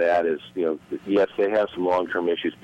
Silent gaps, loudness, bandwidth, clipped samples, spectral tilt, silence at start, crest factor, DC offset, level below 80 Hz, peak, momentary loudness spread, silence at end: none; -24 LUFS; 8.8 kHz; under 0.1%; -6.5 dB/octave; 0 s; 12 dB; under 0.1%; -62 dBFS; -12 dBFS; 6 LU; 0.1 s